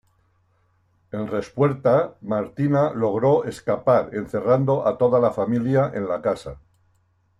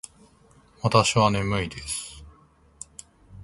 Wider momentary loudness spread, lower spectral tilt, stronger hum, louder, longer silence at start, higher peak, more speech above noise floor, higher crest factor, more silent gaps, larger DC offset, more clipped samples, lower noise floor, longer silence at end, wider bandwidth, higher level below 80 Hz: second, 9 LU vs 24 LU; first, -8.5 dB/octave vs -4.5 dB/octave; neither; about the same, -22 LUFS vs -23 LUFS; first, 1.15 s vs 0.85 s; about the same, -6 dBFS vs -4 dBFS; first, 43 dB vs 34 dB; second, 16 dB vs 24 dB; neither; neither; neither; first, -64 dBFS vs -57 dBFS; first, 0.8 s vs 0 s; about the same, 12 kHz vs 11.5 kHz; second, -56 dBFS vs -48 dBFS